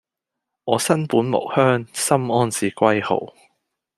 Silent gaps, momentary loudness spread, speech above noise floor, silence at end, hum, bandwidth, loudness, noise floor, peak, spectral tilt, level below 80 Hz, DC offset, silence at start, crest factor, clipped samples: none; 6 LU; 64 dB; 0.7 s; none; 15 kHz; -20 LUFS; -83 dBFS; -2 dBFS; -5 dB/octave; -64 dBFS; under 0.1%; 0.65 s; 18 dB; under 0.1%